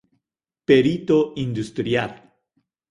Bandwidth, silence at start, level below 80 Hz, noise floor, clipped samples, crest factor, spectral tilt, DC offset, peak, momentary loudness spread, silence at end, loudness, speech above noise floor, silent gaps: 11.5 kHz; 0.7 s; -56 dBFS; -82 dBFS; under 0.1%; 18 dB; -7 dB/octave; under 0.1%; -4 dBFS; 11 LU; 0.75 s; -20 LUFS; 63 dB; none